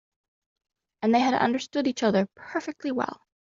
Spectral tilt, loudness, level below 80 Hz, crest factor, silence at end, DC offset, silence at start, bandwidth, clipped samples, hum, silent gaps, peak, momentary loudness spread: -4 dB/octave; -26 LUFS; -70 dBFS; 18 dB; 0.4 s; under 0.1%; 1 s; 7.6 kHz; under 0.1%; none; none; -8 dBFS; 10 LU